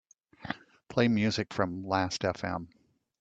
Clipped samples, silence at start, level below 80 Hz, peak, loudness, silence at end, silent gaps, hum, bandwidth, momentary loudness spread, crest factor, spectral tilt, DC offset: under 0.1%; 0.4 s; -64 dBFS; -10 dBFS; -31 LUFS; 0.55 s; none; none; 8.2 kHz; 14 LU; 22 dB; -5.5 dB/octave; under 0.1%